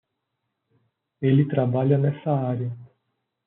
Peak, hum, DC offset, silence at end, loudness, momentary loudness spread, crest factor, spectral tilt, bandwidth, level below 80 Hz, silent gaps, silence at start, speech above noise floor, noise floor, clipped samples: -8 dBFS; none; under 0.1%; 0.6 s; -23 LUFS; 10 LU; 18 dB; -9 dB/octave; 3.9 kHz; -68 dBFS; none; 1.2 s; 58 dB; -79 dBFS; under 0.1%